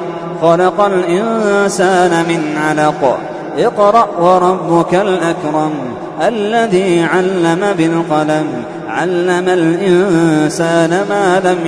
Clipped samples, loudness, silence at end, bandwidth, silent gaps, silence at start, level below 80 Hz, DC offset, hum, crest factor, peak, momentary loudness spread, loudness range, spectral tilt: under 0.1%; -12 LUFS; 0 s; 11 kHz; none; 0 s; -52 dBFS; under 0.1%; none; 12 dB; 0 dBFS; 6 LU; 2 LU; -5.5 dB/octave